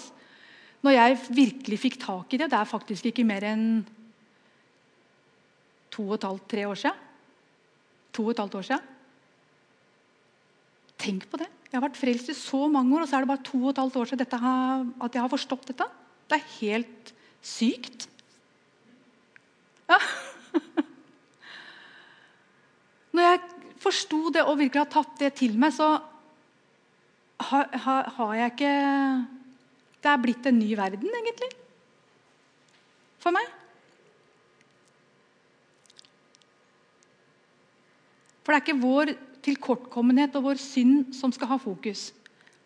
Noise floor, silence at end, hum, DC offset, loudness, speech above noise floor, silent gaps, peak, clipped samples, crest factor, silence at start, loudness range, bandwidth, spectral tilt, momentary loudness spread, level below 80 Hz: -64 dBFS; 0.55 s; none; under 0.1%; -26 LUFS; 39 dB; none; -6 dBFS; under 0.1%; 24 dB; 0 s; 10 LU; 10.5 kHz; -4.5 dB/octave; 15 LU; -90 dBFS